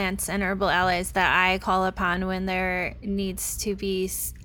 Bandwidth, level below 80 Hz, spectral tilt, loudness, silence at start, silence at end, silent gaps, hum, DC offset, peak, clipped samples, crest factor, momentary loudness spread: 19 kHz; -42 dBFS; -3.5 dB/octave; -25 LUFS; 0 s; 0 s; none; none; under 0.1%; -6 dBFS; under 0.1%; 18 dB; 7 LU